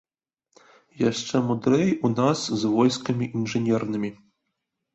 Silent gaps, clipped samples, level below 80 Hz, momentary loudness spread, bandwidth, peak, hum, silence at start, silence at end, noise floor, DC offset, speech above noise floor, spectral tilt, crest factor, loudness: none; under 0.1%; -62 dBFS; 6 LU; 8.2 kHz; -8 dBFS; none; 0.95 s; 0.8 s; -80 dBFS; under 0.1%; 57 dB; -6 dB/octave; 18 dB; -24 LUFS